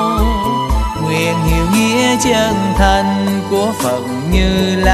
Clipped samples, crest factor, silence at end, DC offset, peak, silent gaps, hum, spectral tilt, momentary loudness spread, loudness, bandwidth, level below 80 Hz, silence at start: under 0.1%; 14 dB; 0 s; under 0.1%; 0 dBFS; none; none; -5 dB/octave; 5 LU; -14 LUFS; 14 kHz; -20 dBFS; 0 s